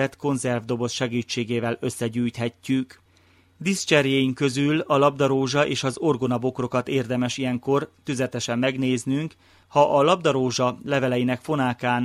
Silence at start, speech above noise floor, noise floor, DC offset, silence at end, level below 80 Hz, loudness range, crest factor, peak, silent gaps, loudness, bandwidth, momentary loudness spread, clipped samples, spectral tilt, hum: 0 s; 35 dB; -58 dBFS; under 0.1%; 0 s; -62 dBFS; 4 LU; 20 dB; -4 dBFS; none; -23 LUFS; 14 kHz; 7 LU; under 0.1%; -5 dB/octave; none